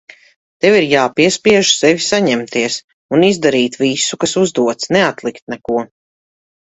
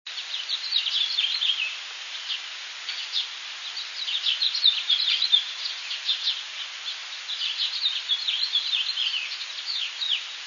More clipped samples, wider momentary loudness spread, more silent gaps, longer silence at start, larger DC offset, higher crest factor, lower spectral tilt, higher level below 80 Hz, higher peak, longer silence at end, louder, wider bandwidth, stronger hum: neither; about the same, 10 LU vs 12 LU; first, 2.84-3.09 s, 5.42-5.47 s vs none; first, 0.65 s vs 0.05 s; neither; second, 14 dB vs 20 dB; first, -3.5 dB/octave vs 6.5 dB/octave; first, -54 dBFS vs under -90 dBFS; first, 0 dBFS vs -8 dBFS; first, 0.8 s vs 0 s; first, -14 LUFS vs -25 LUFS; first, 8.4 kHz vs 7.4 kHz; neither